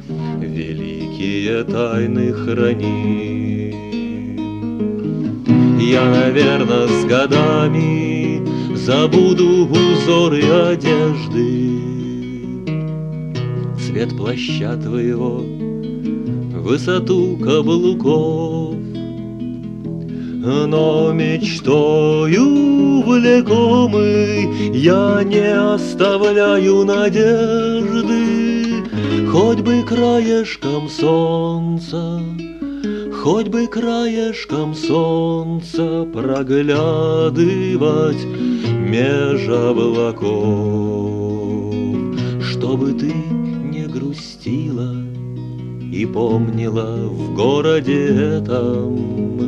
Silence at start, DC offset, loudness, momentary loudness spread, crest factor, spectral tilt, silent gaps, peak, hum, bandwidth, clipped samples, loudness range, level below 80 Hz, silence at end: 0 s; under 0.1%; -16 LUFS; 11 LU; 16 dB; -7 dB/octave; none; 0 dBFS; none; 8.8 kHz; under 0.1%; 7 LU; -46 dBFS; 0 s